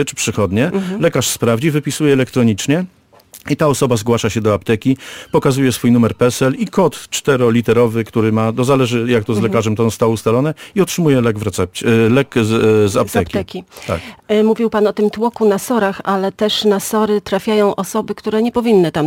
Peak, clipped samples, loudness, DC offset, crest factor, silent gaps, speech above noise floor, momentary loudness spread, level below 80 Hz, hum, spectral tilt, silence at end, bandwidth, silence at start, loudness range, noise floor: -2 dBFS; under 0.1%; -15 LUFS; under 0.1%; 12 dB; none; 28 dB; 6 LU; -46 dBFS; none; -5.5 dB/octave; 0 s; 17 kHz; 0 s; 2 LU; -43 dBFS